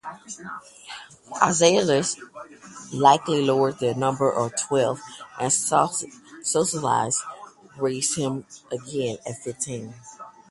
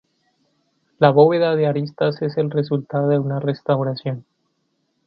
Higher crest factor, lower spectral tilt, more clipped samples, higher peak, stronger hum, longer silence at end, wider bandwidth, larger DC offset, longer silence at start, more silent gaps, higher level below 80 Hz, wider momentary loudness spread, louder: about the same, 22 dB vs 20 dB; second, -3.5 dB/octave vs -10 dB/octave; neither; about the same, -2 dBFS vs 0 dBFS; neither; second, 0.2 s vs 0.85 s; first, 11.5 kHz vs 5.6 kHz; neither; second, 0.05 s vs 1 s; neither; about the same, -64 dBFS vs -66 dBFS; first, 21 LU vs 10 LU; second, -23 LUFS vs -19 LUFS